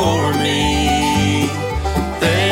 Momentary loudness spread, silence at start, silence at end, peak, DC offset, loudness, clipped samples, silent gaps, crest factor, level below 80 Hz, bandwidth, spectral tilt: 5 LU; 0 s; 0 s; -4 dBFS; under 0.1%; -17 LUFS; under 0.1%; none; 12 dB; -28 dBFS; 16.5 kHz; -4.5 dB/octave